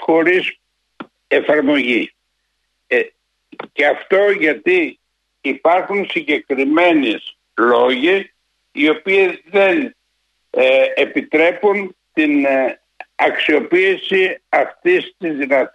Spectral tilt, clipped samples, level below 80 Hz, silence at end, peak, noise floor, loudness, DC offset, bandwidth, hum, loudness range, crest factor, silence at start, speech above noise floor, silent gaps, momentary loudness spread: -5.5 dB/octave; under 0.1%; -68 dBFS; 0.05 s; -2 dBFS; -69 dBFS; -15 LUFS; under 0.1%; 9 kHz; none; 2 LU; 14 dB; 0 s; 54 dB; none; 11 LU